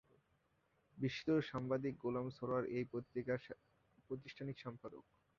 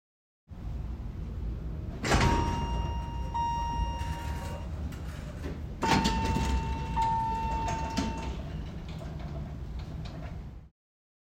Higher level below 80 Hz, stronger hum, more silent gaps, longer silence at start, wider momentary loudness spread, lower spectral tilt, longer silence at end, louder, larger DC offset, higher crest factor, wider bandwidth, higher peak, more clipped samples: second, -74 dBFS vs -38 dBFS; neither; neither; first, 0.95 s vs 0.5 s; about the same, 16 LU vs 14 LU; about the same, -6 dB/octave vs -5.5 dB/octave; second, 0.35 s vs 0.7 s; second, -43 LUFS vs -33 LUFS; neither; about the same, 18 dB vs 20 dB; second, 7.2 kHz vs 16 kHz; second, -26 dBFS vs -12 dBFS; neither